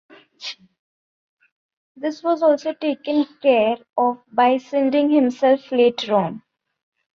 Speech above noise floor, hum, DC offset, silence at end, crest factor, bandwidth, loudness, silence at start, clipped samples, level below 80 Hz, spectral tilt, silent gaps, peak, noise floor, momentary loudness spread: 18 dB; none; under 0.1%; 0.8 s; 16 dB; 7.4 kHz; -19 LUFS; 0.4 s; under 0.1%; -70 dBFS; -6 dB/octave; 0.79-1.37 s, 1.52-1.69 s, 1.77-1.95 s; -4 dBFS; -37 dBFS; 15 LU